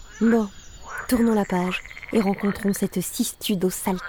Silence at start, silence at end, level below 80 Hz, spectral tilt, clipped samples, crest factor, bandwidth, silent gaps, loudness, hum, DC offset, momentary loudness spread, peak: 0 s; 0 s; -48 dBFS; -5 dB/octave; under 0.1%; 16 dB; over 20 kHz; none; -24 LUFS; none; under 0.1%; 10 LU; -8 dBFS